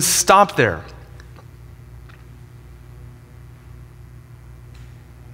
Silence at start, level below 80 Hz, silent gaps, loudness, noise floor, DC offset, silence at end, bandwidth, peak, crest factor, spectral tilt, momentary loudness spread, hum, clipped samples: 0 s; -44 dBFS; none; -15 LUFS; -42 dBFS; under 0.1%; 0 s; 16.5 kHz; 0 dBFS; 22 dB; -2.5 dB/octave; 30 LU; 60 Hz at -45 dBFS; under 0.1%